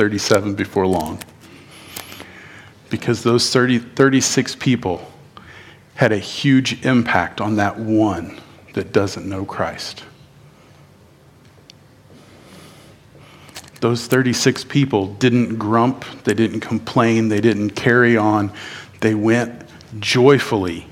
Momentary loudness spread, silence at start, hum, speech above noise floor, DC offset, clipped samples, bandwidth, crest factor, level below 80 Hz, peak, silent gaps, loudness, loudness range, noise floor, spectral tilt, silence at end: 19 LU; 0 s; none; 31 dB; under 0.1%; under 0.1%; 17 kHz; 18 dB; -54 dBFS; 0 dBFS; none; -18 LUFS; 9 LU; -48 dBFS; -5 dB/octave; 0 s